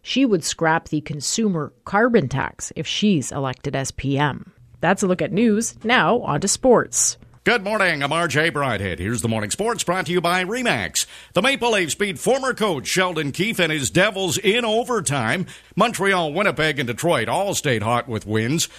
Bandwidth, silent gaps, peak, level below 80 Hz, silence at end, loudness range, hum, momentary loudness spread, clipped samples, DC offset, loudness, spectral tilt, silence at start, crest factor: 14 kHz; none; -2 dBFS; -50 dBFS; 0 s; 3 LU; none; 7 LU; under 0.1%; under 0.1%; -20 LUFS; -3.5 dB/octave; 0.05 s; 18 dB